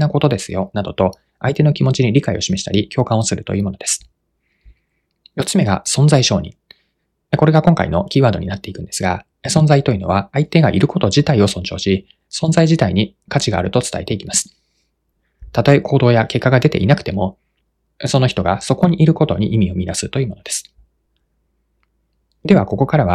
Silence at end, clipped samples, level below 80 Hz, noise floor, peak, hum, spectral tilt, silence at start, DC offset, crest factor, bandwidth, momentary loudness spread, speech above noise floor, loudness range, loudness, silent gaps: 0 s; under 0.1%; -44 dBFS; -68 dBFS; 0 dBFS; none; -5.5 dB/octave; 0 s; under 0.1%; 16 dB; 13 kHz; 10 LU; 53 dB; 4 LU; -16 LUFS; none